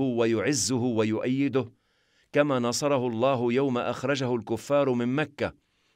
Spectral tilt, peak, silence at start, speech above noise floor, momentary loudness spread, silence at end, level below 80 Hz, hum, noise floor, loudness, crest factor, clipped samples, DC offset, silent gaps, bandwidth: -5 dB/octave; -10 dBFS; 0 s; 42 dB; 6 LU; 0.45 s; -66 dBFS; none; -68 dBFS; -26 LUFS; 16 dB; under 0.1%; under 0.1%; none; 15 kHz